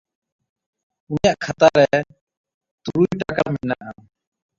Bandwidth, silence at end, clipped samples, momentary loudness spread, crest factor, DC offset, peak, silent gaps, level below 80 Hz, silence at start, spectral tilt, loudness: 7.6 kHz; 0.65 s; under 0.1%; 17 LU; 20 dB; under 0.1%; -2 dBFS; 2.21-2.27 s, 2.37-2.44 s, 2.54-2.61 s, 2.71-2.78 s; -50 dBFS; 1.1 s; -6 dB/octave; -19 LUFS